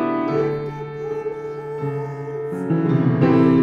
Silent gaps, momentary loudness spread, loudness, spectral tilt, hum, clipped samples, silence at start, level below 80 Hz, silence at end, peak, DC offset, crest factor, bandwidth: none; 13 LU; -22 LUFS; -10 dB/octave; none; under 0.1%; 0 s; -54 dBFS; 0 s; -2 dBFS; under 0.1%; 18 dB; 6.6 kHz